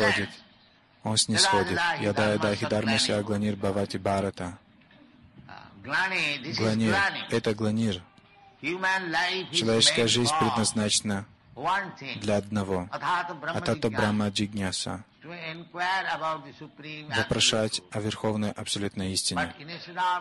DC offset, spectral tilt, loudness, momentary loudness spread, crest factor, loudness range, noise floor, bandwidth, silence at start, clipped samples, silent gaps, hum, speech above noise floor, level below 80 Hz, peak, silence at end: under 0.1%; -3.5 dB/octave; -26 LUFS; 15 LU; 20 dB; 5 LU; -59 dBFS; 12 kHz; 0 s; under 0.1%; none; none; 32 dB; -54 dBFS; -8 dBFS; 0 s